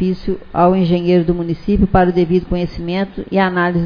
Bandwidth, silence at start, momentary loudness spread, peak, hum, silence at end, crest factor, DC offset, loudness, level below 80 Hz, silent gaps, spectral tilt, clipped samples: 5.2 kHz; 0 s; 8 LU; 0 dBFS; none; 0 s; 14 dB; under 0.1%; -16 LUFS; -30 dBFS; none; -9.5 dB/octave; under 0.1%